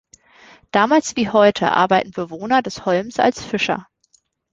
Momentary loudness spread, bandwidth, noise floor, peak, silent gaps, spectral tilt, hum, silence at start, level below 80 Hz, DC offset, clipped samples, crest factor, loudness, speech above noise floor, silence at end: 7 LU; 9.2 kHz; -61 dBFS; -2 dBFS; none; -4.5 dB/octave; none; 0.75 s; -56 dBFS; under 0.1%; under 0.1%; 18 dB; -18 LUFS; 44 dB; 0.7 s